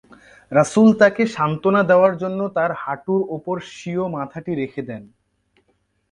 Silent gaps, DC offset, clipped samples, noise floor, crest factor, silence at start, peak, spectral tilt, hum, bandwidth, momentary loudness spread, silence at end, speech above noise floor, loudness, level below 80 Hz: none; under 0.1%; under 0.1%; -66 dBFS; 18 dB; 0.5 s; -2 dBFS; -6.5 dB/octave; none; 11 kHz; 14 LU; 1.05 s; 48 dB; -19 LUFS; -60 dBFS